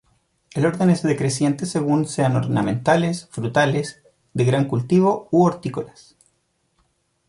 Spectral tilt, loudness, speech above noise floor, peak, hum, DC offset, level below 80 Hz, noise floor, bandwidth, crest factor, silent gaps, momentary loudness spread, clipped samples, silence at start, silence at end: -6.5 dB/octave; -20 LUFS; 49 dB; -4 dBFS; none; under 0.1%; -58 dBFS; -68 dBFS; 11.5 kHz; 16 dB; none; 11 LU; under 0.1%; 0.55 s; 1.4 s